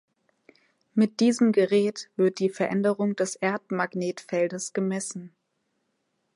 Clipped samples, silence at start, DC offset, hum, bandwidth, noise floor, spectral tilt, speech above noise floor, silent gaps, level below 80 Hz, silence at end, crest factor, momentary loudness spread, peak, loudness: under 0.1%; 0.95 s; under 0.1%; none; 11.5 kHz; -76 dBFS; -5.5 dB/octave; 51 dB; none; -78 dBFS; 1.1 s; 16 dB; 8 LU; -10 dBFS; -26 LUFS